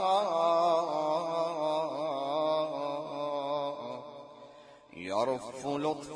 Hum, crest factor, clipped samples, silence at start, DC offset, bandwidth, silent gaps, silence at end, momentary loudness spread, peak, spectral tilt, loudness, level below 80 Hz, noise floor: none; 16 dB; under 0.1%; 0 s; under 0.1%; 10.5 kHz; none; 0 s; 16 LU; -16 dBFS; -5 dB/octave; -32 LUFS; -76 dBFS; -54 dBFS